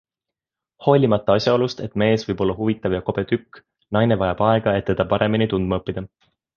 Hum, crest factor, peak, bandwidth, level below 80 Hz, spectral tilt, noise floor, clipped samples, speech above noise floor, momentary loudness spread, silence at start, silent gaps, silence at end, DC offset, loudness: none; 20 dB; -2 dBFS; 7 kHz; -44 dBFS; -7.5 dB/octave; -87 dBFS; under 0.1%; 67 dB; 7 LU; 0.8 s; none; 0.5 s; under 0.1%; -20 LUFS